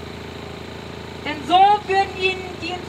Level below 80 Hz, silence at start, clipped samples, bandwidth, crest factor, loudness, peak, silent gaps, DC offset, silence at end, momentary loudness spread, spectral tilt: -50 dBFS; 0 s; under 0.1%; 13.5 kHz; 18 dB; -19 LUFS; -4 dBFS; none; under 0.1%; 0 s; 19 LU; -4.5 dB/octave